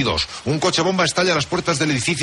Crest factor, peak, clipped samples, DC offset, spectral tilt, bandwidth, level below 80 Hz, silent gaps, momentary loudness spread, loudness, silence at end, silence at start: 14 dB; -6 dBFS; under 0.1%; under 0.1%; -3.5 dB/octave; 11.5 kHz; -44 dBFS; none; 4 LU; -19 LUFS; 0 s; 0 s